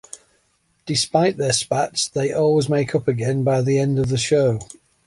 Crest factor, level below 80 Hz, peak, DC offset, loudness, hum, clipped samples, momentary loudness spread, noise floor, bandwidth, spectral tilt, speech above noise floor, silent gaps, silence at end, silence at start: 16 dB; -52 dBFS; -4 dBFS; under 0.1%; -20 LUFS; none; under 0.1%; 10 LU; -65 dBFS; 11.5 kHz; -5 dB/octave; 45 dB; none; 0.4 s; 0.15 s